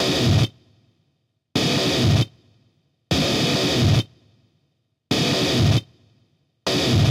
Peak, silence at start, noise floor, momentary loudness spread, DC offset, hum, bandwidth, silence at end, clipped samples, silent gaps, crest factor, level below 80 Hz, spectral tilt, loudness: -6 dBFS; 0 s; -70 dBFS; 7 LU; under 0.1%; none; 16 kHz; 0 s; under 0.1%; none; 16 dB; -42 dBFS; -5 dB/octave; -20 LUFS